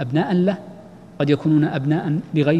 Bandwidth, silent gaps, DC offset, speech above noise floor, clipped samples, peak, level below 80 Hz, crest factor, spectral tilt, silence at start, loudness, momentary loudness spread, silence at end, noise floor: 7.8 kHz; none; 0.1%; 22 dB; under 0.1%; -4 dBFS; -58 dBFS; 16 dB; -9 dB/octave; 0 s; -20 LUFS; 8 LU; 0 s; -41 dBFS